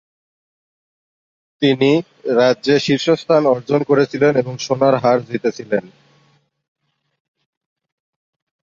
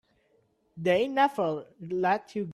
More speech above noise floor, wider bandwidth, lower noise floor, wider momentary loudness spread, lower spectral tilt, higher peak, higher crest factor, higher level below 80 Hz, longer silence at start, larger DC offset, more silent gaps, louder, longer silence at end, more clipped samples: about the same, 43 dB vs 41 dB; second, 7.6 kHz vs 13 kHz; second, -58 dBFS vs -69 dBFS; about the same, 8 LU vs 9 LU; about the same, -6 dB/octave vs -6.5 dB/octave; first, -2 dBFS vs -12 dBFS; about the same, 16 dB vs 18 dB; first, -62 dBFS vs -72 dBFS; first, 1.6 s vs 0.75 s; neither; neither; first, -16 LUFS vs -28 LUFS; first, 2.8 s vs 0 s; neither